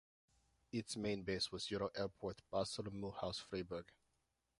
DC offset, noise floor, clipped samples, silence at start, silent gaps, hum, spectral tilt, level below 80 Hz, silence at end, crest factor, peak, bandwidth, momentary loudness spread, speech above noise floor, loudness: under 0.1%; -85 dBFS; under 0.1%; 0.75 s; none; none; -4.5 dB/octave; -68 dBFS; 0.75 s; 20 dB; -26 dBFS; 11.5 kHz; 6 LU; 41 dB; -44 LUFS